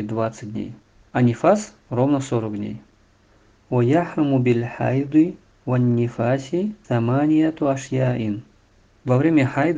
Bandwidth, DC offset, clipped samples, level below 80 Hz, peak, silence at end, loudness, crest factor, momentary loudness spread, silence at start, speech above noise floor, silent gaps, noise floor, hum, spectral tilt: 9.4 kHz; under 0.1%; under 0.1%; -56 dBFS; -2 dBFS; 0 s; -21 LUFS; 18 dB; 13 LU; 0 s; 36 dB; none; -56 dBFS; none; -8 dB/octave